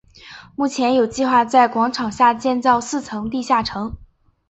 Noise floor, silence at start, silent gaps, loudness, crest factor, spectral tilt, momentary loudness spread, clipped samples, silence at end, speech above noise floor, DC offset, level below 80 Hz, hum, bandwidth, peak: -42 dBFS; 0.25 s; none; -18 LUFS; 16 dB; -4 dB/octave; 10 LU; under 0.1%; 0.45 s; 24 dB; under 0.1%; -48 dBFS; none; 8.2 kHz; -2 dBFS